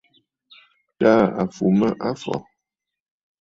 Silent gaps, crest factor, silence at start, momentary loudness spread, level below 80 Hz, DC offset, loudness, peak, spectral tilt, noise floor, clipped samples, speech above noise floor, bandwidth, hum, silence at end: none; 20 dB; 1 s; 12 LU; -58 dBFS; under 0.1%; -20 LUFS; -2 dBFS; -7.5 dB/octave; -84 dBFS; under 0.1%; 65 dB; 7.8 kHz; none; 1 s